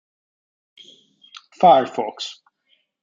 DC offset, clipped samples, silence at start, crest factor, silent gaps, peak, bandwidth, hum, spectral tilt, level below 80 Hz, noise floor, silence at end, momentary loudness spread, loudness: under 0.1%; under 0.1%; 1.6 s; 20 dB; none; -2 dBFS; 7.6 kHz; none; -5 dB/octave; -70 dBFS; -66 dBFS; 0.7 s; 18 LU; -17 LUFS